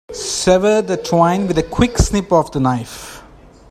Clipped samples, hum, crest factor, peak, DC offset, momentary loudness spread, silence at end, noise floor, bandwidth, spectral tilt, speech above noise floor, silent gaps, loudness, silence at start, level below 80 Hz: under 0.1%; none; 16 dB; 0 dBFS; under 0.1%; 10 LU; 0.5 s; -42 dBFS; 15.5 kHz; -5 dB/octave; 27 dB; none; -16 LUFS; 0.1 s; -28 dBFS